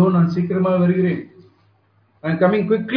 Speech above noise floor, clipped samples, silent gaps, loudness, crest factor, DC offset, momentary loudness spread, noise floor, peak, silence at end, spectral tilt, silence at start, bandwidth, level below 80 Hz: 42 dB; under 0.1%; none; -18 LUFS; 16 dB; under 0.1%; 9 LU; -59 dBFS; -4 dBFS; 0 s; -10 dB/octave; 0 s; 5.4 kHz; -60 dBFS